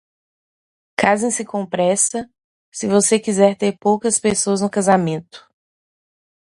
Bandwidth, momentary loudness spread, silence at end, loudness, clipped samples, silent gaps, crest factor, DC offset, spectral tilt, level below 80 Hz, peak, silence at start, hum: 11.5 kHz; 12 LU; 1.15 s; -17 LUFS; under 0.1%; 2.44-2.72 s; 20 dB; under 0.1%; -4 dB/octave; -60 dBFS; 0 dBFS; 1 s; none